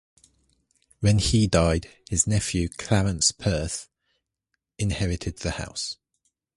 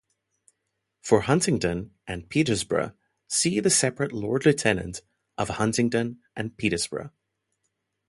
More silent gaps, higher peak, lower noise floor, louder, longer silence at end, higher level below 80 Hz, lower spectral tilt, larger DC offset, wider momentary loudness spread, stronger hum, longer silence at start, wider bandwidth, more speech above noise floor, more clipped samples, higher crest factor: neither; about the same, -6 dBFS vs -6 dBFS; about the same, -80 dBFS vs -79 dBFS; about the same, -25 LUFS vs -25 LUFS; second, 0.6 s vs 1 s; first, -38 dBFS vs -52 dBFS; about the same, -4.5 dB/octave vs -4 dB/octave; neither; second, 11 LU vs 15 LU; neither; about the same, 1 s vs 1.05 s; about the same, 11.5 kHz vs 12 kHz; about the same, 56 dB vs 55 dB; neither; about the same, 20 dB vs 22 dB